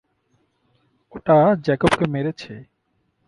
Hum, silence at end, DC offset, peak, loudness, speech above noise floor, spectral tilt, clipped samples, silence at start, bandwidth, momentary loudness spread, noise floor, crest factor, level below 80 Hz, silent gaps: none; 0.65 s; under 0.1%; -2 dBFS; -19 LUFS; 50 dB; -7 dB/octave; under 0.1%; 1.15 s; 11.5 kHz; 23 LU; -69 dBFS; 20 dB; -50 dBFS; none